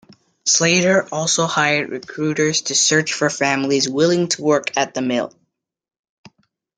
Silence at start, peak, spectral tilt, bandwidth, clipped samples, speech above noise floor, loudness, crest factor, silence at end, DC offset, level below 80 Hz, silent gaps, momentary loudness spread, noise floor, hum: 0.45 s; 0 dBFS; -3 dB/octave; 10.5 kHz; under 0.1%; 52 dB; -17 LUFS; 20 dB; 1.5 s; under 0.1%; -64 dBFS; none; 8 LU; -70 dBFS; none